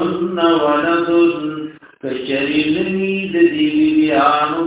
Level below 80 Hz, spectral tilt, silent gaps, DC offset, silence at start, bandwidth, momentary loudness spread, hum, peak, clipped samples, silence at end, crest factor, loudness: -52 dBFS; -9.5 dB/octave; none; under 0.1%; 0 s; 4 kHz; 11 LU; none; 0 dBFS; under 0.1%; 0 s; 14 dB; -16 LUFS